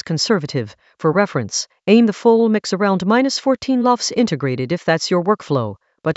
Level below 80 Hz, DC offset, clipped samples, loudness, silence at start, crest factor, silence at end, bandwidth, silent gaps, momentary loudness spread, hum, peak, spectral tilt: -60 dBFS; under 0.1%; under 0.1%; -17 LUFS; 0.05 s; 16 dB; 0 s; 8.2 kHz; none; 8 LU; none; 0 dBFS; -5 dB/octave